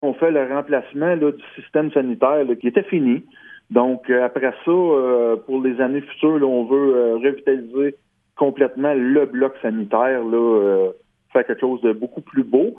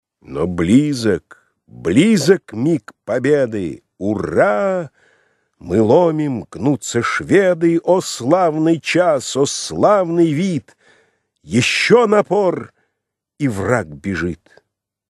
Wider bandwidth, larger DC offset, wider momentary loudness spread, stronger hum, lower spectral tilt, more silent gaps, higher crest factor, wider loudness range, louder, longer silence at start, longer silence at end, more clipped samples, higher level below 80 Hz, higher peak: second, 3.7 kHz vs 13 kHz; neither; second, 6 LU vs 11 LU; neither; first, -10 dB/octave vs -5.5 dB/octave; neither; about the same, 18 dB vs 16 dB; about the same, 2 LU vs 3 LU; second, -19 LUFS vs -16 LUFS; second, 0 s vs 0.3 s; second, 0.05 s vs 0.75 s; neither; second, -70 dBFS vs -50 dBFS; about the same, 0 dBFS vs 0 dBFS